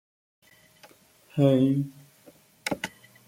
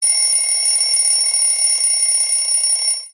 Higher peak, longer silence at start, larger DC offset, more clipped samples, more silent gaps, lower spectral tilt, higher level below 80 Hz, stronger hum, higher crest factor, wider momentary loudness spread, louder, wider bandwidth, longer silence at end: second, -8 dBFS vs -4 dBFS; first, 1.35 s vs 0 s; neither; neither; neither; first, -7 dB/octave vs 10.5 dB/octave; first, -68 dBFS vs under -90 dBFS; neither; first, 20 dB vs 12 dB; first, 16 LU vs 1 LU; second, -26 LUFS vs -13 LUFS; first, 16 kHz vs 13 kHz; first, 0.4 s vs 0.05 s